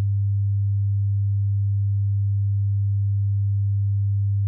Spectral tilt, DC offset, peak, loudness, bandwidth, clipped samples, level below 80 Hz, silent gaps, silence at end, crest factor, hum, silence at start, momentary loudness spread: -28.5 dB/octave; under 0.1%; -18 dBFS; -23 LUFS; 0.2 kHz; under 0.1%; -54 dBFS; none; 0 s; 4 dB; none; 0 s; 0 LU